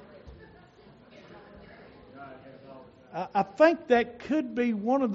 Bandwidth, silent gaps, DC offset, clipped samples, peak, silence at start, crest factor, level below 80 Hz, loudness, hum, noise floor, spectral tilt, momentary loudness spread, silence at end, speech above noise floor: 7.6 kHz; none; under 0.1%; under 0.1%; -8 dBFS; 0.15 s; 22 dB; -62 dBFS; -26 LUFS; none; -54 dBFS; -4.5 dB/octave; 27 LU; 0 s; 29 dB